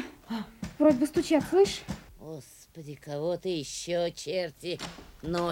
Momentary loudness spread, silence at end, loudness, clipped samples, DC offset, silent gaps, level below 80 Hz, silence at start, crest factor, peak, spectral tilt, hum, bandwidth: 20 LU; 0 s; -29 LUFS; under 0.1%; under 0.1%; none; -56 dBFS; 0 s; 20 dB; -10 dBFS; -5 dB/octave; none; 17 kHz